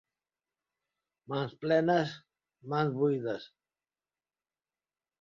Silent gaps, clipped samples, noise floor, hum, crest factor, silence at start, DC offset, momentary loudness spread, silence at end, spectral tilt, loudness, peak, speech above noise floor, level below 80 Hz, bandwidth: none; under 0.1%; under -90 dBFS; none; 20 dB; 1.3 s; under 0.1%; 11 LU; 1.75 s; -7.5 dB/octave; -31 LUFS; -14 dBFS; over 60 dB; -76 dBFS; 7.4 kHz